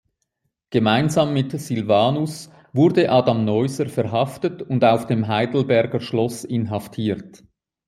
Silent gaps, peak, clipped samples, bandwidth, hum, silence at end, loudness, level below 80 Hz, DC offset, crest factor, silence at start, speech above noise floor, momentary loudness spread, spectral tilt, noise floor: none; -2 dBFS; under 0.1%; 15.5 kHz; none; 0.5 s; -20 LUFS; -60 dBFS; under 0.1%; 18 dB; 0.7 s; 55 dB; 8 LU; -6.5 dB/octave; -74 dBFS